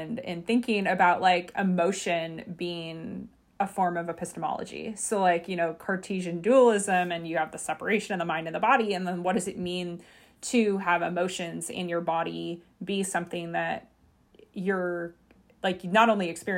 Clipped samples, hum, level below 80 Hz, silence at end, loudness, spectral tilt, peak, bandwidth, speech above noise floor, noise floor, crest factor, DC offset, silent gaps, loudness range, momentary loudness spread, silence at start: under 0.1%; none; -66 dBFS; 0 s; -27 LUFS; -4.5 dB/octave; -6 dBFS; 16 kHz; 34 dB; -62 dBFS; 22 dB; under 0.1%; none; 6 LU; 14 LU; 0 s